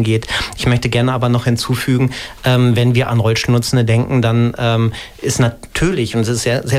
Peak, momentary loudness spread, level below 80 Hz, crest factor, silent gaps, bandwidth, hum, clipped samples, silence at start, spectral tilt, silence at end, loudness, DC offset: -2 dBFS; 4 LU; -36 dBFS; 12 dB; none; 15 kHz; none; under 0.1%; 0 s; -5.5 dB/octave; 0 s; -15 LUFS; under 0.1%